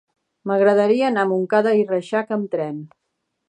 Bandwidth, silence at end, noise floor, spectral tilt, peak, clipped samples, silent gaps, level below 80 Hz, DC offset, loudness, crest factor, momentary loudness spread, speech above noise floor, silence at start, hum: 9.4 kHz; 0.65 s; -76 dBFS; -7 dB/octave; -4 dBFS; under 0.1%; none; -76 dBFS; under 0.1%; -19 LUFS; 16 dB; 11 LU; 57 dB; 0.45 s; none